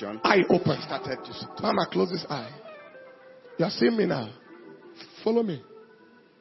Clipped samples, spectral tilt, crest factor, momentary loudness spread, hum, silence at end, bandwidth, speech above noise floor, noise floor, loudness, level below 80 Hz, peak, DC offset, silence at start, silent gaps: under 0.1%; -7 dB/octave; 26 dB; 24 LU; none; 0.6 s; 6 kHz; 29 dB; -55 dBFS; -26 LUFS; -68 dBFS; -2 dBFS; under 0.1%; 0 s; none